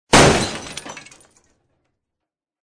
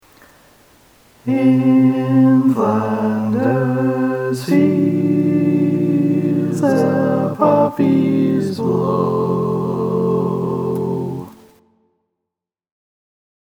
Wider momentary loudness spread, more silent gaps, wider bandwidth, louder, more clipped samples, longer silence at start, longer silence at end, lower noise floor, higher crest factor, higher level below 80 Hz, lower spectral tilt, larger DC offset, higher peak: first, 24 LU vs 7 LU; neither; second, 10.5 kHz vs 14 kHz; about the same, -15 LUFS vs -16 LUFS; neither; second, 0.1 s vs 1.25 s; second, 1.7 s vs 2.1 s; about the same, -84 dBFS vs -83 dBFS; about the same, 20 dB vs 16 dB; first, -36 dBFS vs -60 dBFS; second, -3.5 dB/octave vs -8.5 dB/octave; neither; about the same, 0 dBFS vs 0 dBFS